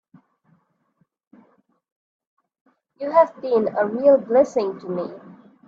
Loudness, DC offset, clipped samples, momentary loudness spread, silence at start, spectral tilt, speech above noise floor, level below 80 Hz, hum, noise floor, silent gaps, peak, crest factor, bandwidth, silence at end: -20 LUFS; under 0.1%; under 0.1%; 15 LU; 3 s; -7 dB/octave; 49 dB; -70 dBFS; none; -68 dBFS; none; -4 dBFS; 20 dB; 7.4 kHz; 0.35 s